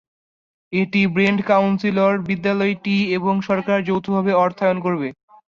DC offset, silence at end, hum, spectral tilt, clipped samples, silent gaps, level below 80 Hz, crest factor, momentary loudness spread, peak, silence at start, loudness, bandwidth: under 0.1%; 0.45 s; none; -7.5 dB/octave; under 0.1%; none; -60 dBFS; 16 dB; 5 LU; -4 dBFS; 0.7 s; -19 LUFS; 7 kHz